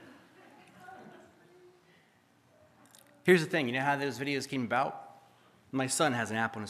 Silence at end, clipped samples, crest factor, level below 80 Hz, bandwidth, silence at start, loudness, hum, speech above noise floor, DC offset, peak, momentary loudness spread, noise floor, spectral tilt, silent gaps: 0 s; under 0.1%; 24 dB; -82 dBFS; 14.5 kHz; 0 s; -30 LUFS; none; 36 dB; under 0.1%; -10 dBFS; 24 LU; -66 dBFS; -4.5 dB/octave; none